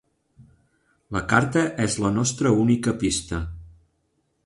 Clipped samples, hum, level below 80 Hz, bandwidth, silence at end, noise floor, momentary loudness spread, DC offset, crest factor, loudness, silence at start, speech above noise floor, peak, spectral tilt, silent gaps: under 0.1%; none; -44 dBFS; 11.5 kHz; 0.75 s; -71 dBFS; 11 LU; under 0.1%; 22 dB; -23 LUFS; 0.4 s; 49 dB; -4 dBFS; -5 dB/octave; none